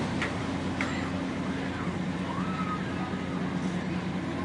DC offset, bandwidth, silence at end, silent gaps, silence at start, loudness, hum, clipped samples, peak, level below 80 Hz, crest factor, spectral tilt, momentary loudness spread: under 0.1%; 11 kHz; 0 s; none; 0 s; -32 LUFS; none; under 0.1%; -14 dBFS; -54 dBFS; 16 dB; -6 dB/octave; 2 LU